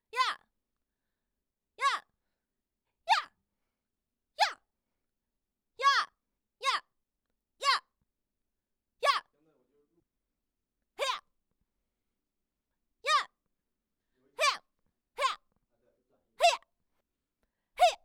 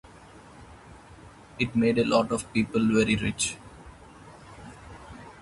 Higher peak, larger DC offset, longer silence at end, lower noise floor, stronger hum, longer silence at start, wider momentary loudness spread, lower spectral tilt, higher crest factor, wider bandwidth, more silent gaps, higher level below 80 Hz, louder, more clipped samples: second, -12 dBFS vs -8 dBFS; neither; about the same, 0.1 s vs 0 s; first, -88 dBFS vs -49 dBFS; neither; second, 0.15 s vs 0.35 s; second, 17 LU vs 25 LU; second, 2.5 dB/octave vs -4.5 dB/octave; about the same, 24 dB vs 20 dB; first, 18.5 kHz vs 11.5 kHz; neither; second, -78 dBFS vs -52 dBFS; second, -31 LUFS vs -25 LUFS; neither